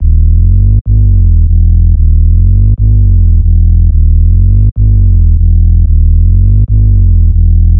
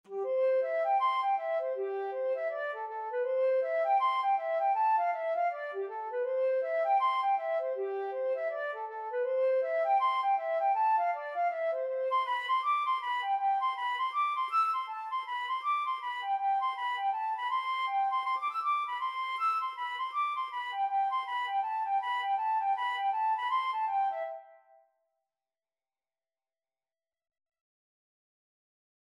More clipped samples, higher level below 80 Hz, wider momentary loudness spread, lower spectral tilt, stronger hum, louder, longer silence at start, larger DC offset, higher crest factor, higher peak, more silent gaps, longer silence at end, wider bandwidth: neither; first, -6 dBFS vs under -90 dBFS; second, 1 LU vs 7 LU; first, -21 dB/octave vs -1 dB/octave; neither; first, -8 LUFS vs -31 LUFS; about the same, 0 s vs 0.1 s; first, 4% vs under 0.1%; second, 4 dB vs 12 dB; first, 0 dBFS vs -20 dBFS; first, 0.81-0.85 s vs none; second, 0 s vs 4.55 s; second, 0.6 kHz vs 11.5 kHz